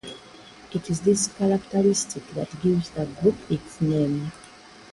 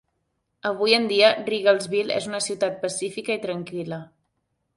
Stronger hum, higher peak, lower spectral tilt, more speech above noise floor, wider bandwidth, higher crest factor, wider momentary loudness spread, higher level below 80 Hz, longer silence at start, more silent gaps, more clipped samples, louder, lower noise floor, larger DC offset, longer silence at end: neither; second, -8 dBFS vs -2 dBFS; first, -5.5 dB/octave vs -3 dB/octave; second, 23 dB vs 52 dB; about the same, 11.5 kHz vs 11.5 kHz; about the same, 18 dB vs 22 dB; about the same, 12 LU vs 13 LU; first, -54 dBFS vs -70 dBFS; second, 0.05 s vs 0.65 s; neither; neither; about the same, -25 LUFS vs -23 LUFS; second, -47 dBFS vs -75 dBFS; neither; second, 0.45 s vs 0.7 s